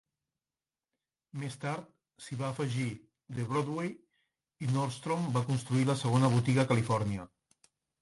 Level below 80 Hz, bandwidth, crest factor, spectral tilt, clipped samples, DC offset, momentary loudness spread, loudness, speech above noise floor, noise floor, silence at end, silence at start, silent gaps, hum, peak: -64 dBFS; 11.5 kHz; 20 dB; -6.5 dB/octave; under 0.1%; under 0.1%; 14 LU; -32 LUFS; over 59 dB; under -90 dBFS; 0.75 s; 1.35 s; none; none; -12 dBFS